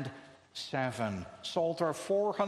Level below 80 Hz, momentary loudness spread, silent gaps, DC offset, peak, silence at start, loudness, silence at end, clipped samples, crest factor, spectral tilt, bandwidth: -70 dBFS; 12 LU; none; under 0.1%; -16 dBFS; 0 s; -34 LUFS; 0 s; under 0.1%; 18 dB; -5 dB/octave; 13 kHz